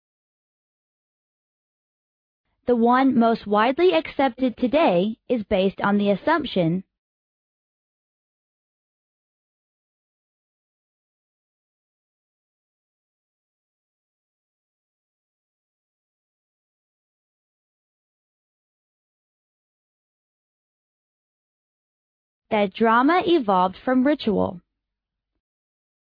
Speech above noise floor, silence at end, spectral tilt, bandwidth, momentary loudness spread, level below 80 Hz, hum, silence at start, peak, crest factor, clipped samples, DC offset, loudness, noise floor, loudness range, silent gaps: 65 dB; 1.5 s; -9 dB/octave; 5.2 kHz; 7 LU; -60 dBFS; none; 2.65 s; -8 dBFS; 20 dB; under 0.1%; under 0.1%; -21 LUFS; -85 dBFS; 8 LU; 6.98-22.42 s